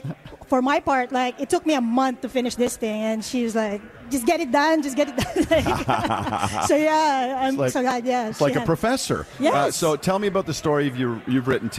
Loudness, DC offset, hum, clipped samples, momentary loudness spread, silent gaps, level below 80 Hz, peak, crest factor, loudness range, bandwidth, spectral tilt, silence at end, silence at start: -22 LUFS; under 0.1%; none; under 0.1%; 6 LU; none; -48 dBFS; -8 dBFS; 14 dB; 2 LU; 15 kHz; -5 dB/octave; 0 s; 0 s